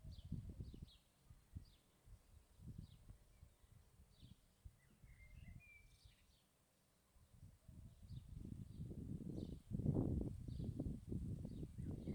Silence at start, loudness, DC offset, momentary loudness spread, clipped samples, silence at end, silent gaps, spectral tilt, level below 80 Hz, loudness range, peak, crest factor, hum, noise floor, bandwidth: 0 s; -50 LUFS; under 0.1%; 22 LU; under 0.1%; 0 s; none; -8.5 dB/octave; -60 dBFS; 19 LU; -26 dBFS; 24 dB; none; -78 dBFS; over 20 kHz